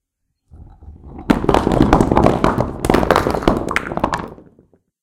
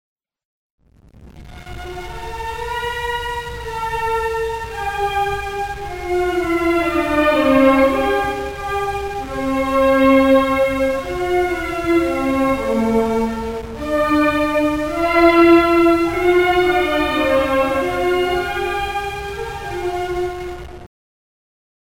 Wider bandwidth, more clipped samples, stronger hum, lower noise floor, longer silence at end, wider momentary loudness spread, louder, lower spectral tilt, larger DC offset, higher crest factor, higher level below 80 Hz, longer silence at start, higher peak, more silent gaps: about the same, 17 kHz vs 17 kHz; first, 0.2% vs under 0.1%; neither; first, -70 dBFS vs -45 dBFS; second, 0.7 s vs 1 s; second, 11 LU vs 14 LU; about the same, -16 LUFS vs -17 LUFS; about the same, -6.5 dB/octave vs -5.5 dB/octave; neither; about the same, 18 dB vs 18 dB; first, -28 dBFS vs -36 dBFS; second, 0.55 s vs 1.15 s; about the same, 0 dBFS vs 0 dBFS; neither